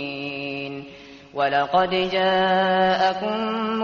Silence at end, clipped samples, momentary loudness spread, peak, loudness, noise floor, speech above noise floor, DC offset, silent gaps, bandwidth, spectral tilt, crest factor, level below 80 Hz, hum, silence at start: 0 s; under 0.1%; 14 LU; -6 dBFS; -21 LUFS; -43 dBFS; 23 dB; under 0.1%; none; 7.2 kHz; -2.5 dB/octave; 16 dB; -58 dBFS; none; 0 s